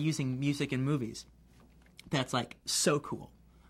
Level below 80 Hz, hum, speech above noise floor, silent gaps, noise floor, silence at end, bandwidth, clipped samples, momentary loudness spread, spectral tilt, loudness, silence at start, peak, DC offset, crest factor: -62 dBFS; none; 27 dB; none; -60 dBFS; 0.45 s; 16 kHz; under 0.1%; 13 LU; -4.5 dB/octave; -33 LUFS; 0 s; -14 dBFS; under 0.1%; 20 dB